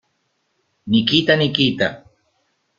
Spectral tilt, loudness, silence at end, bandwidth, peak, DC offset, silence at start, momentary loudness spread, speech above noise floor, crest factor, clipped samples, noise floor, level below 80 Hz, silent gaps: -6 dB/octave; -17 LUFS; 0.8 s; 7.4 kHz; 0 dBFS; under 0.1%; 0.85 s; 8 LU; 52 dB; 20 dB; under 0.1%; -69 dBFS; -54 dBFS; none